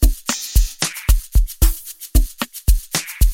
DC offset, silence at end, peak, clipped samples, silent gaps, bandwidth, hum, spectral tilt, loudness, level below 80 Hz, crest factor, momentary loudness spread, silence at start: under 0.1%; 0 s; 0 dBFS; under 0.1%; none; 17 kHz; none; -3.5 dB/octave; -20 LUFS; -18 dBFS; 16 dB; 4 LU; 0 s